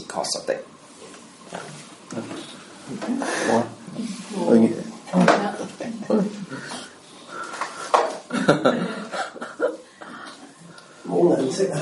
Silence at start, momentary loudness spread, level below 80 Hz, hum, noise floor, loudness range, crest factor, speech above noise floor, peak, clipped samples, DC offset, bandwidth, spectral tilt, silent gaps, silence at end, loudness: 0 s; 22 LU; -68 dBFS; none; -45 dBFS; 7 LU; 24 dB; 23 dB; 0 dBFS; under 0.1%; under 0.1%; 11.5 kHz; -5 dB/octave; none; 0 s; -23 LUFS